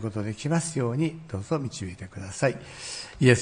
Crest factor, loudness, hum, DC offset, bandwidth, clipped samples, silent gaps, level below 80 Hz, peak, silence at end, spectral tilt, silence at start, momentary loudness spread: 22 dB; -29 LUFS; none; under 0.1%; 10.5 kHz; under 0.1%; none; -58 dBFS; -6 dBFS; 0 s; -5.5 dB/octave; 0 s; 12 LU